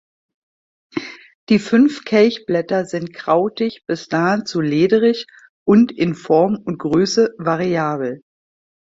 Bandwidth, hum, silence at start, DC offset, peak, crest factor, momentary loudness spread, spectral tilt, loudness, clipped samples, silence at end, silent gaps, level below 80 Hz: 7.8 kHz; none; 0.95 s; under 0.1%; -2 dBFS; 16 dB; 12 LU; -6 dB/octave; -17 LUFS; under 0.1%; 0.7 s; 1.35-1.47 s, 5.49-5.66 s; -58 dBFS